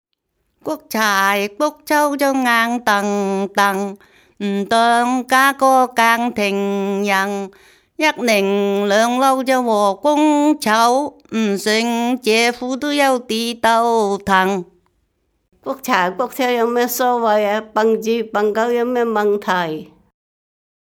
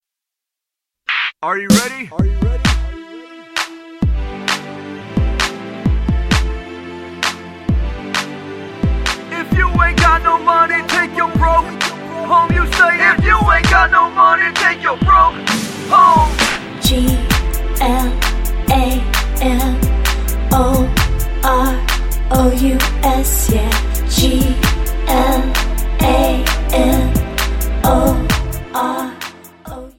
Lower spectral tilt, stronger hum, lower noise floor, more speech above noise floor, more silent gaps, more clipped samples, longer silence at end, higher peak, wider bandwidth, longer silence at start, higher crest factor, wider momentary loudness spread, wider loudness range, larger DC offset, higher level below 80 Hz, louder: about the same, -4 dB/octave vs -4.5 dB/octave; neither; second, -70 dBFS vs -84 dBFS; second, 54 dB vs 71 dB; neither; neither; first, 1 s vs 0.1 s; about the same, 0 dBFS vs 0 dBFS; first, 19.5 kHz vs 17.5 kHz; second, 0.65 s vs 1.1 s; about the same, 18 dB vs 14 dB; second, 8 LU vs 11 LU; second, 3 LU vs 8 LU; neither; second, -60 dBFS vs -18 dBFS; about the same, -16 LUFS vs -15 LUFS